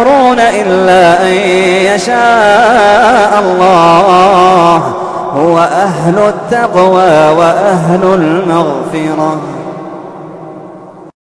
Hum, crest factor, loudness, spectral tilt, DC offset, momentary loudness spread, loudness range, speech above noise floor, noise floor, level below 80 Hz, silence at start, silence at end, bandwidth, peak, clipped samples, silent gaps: none; 8 dB; -7 LUFS; -5.5 dB/octave; under 0.1%; 15 LU; 5 LU; 23 dB; -30 dBFS; -42 dBFS; 0 s; 0.15 s; 11 kHz; 0 dBFS; 0.6%; none